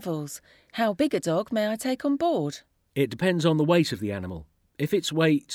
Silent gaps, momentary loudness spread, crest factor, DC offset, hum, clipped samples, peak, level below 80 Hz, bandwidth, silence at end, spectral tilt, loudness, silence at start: none; 15 LU; 18 dB; under 0.1%; none; under 0.1%; -8 dBFS; -60 dBFS; 17.5 kHz; 0 s; -5.5 dB/octave; -26 LUFS; 0 s